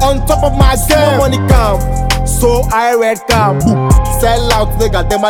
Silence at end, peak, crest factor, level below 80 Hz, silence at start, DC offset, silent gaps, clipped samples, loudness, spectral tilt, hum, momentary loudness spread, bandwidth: 0 s; 0 dBFS; 10 dB; -16 dBFS; 0 s; under 0.1%; none; under 0.1%; -11 LUFS; -5 dB/octave; none; 4 LU; 18 kHz